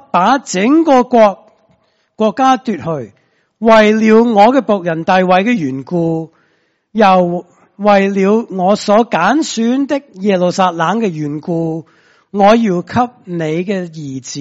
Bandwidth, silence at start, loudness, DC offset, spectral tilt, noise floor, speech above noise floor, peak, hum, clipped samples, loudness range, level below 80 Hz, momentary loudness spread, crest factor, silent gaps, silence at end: 8 kHz; 0.15 s; -12 LUFS; under 0.1%; -6 dB/octave; -59 dBFS; 47 dB; 0 dBFS; none; 0.1%; 4 LU; -52 dBFS; 12 LU; 12 dB; none; 0 s